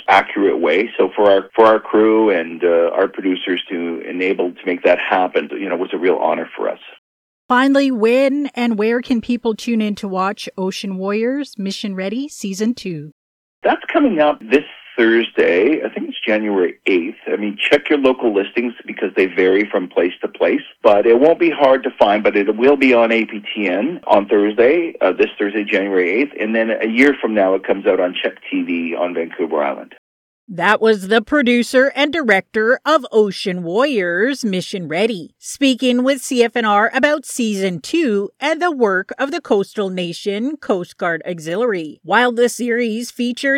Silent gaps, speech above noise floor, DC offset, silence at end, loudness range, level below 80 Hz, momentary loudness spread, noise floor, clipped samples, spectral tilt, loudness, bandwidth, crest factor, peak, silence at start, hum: 6.98-7.49 s, 13.12-13.62 s, 29.98-30.47 s; over 74 dB; under 0.1%; 0 s; 5 LU; -60 dBFS; 9 LU; under -90 dBFS; under 0.1%; -4.5 dB/octave; -16 LUFS; 15.5 kHz; 16 dB; 0 dBFS; 0 s; none